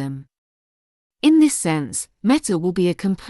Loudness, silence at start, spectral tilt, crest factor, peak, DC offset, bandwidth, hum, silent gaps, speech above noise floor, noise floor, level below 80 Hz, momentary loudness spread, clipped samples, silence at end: -19 LUFS; 0 s; -5 dB/octave; 16 dB; -4 dBFS; under 0.1%; 12 kHz; none; 0.38-1.10 s; over 71 dB; under -90 dBFS; -56 dBFS; 11 LU; under 0.1%; 0 s